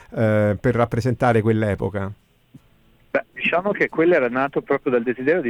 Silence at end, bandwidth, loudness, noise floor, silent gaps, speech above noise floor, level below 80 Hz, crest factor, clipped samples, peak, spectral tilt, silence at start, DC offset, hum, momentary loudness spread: 0 s; 11.5 kHz; -20 LUFS; -55 dBFS; none; 36 dB; -48 dBFS; 14 dB; under 0.1%; -6 dBFS; -8 dB/octave; 0.1 s; under 0.1%; none; 9 LU